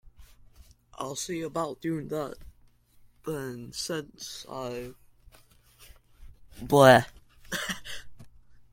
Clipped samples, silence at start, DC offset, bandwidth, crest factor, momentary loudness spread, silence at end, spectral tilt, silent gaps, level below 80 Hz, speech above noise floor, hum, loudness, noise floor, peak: under 0.1%; 0.2 s; under 0.1%; 16.5 kHz; 26 dB; 23 LU; 0.1 s; -4.5 dB/octave; none; -56 dBFS; 33 dB; none; -27 LUFS; -59 dBFS; -4 dBFS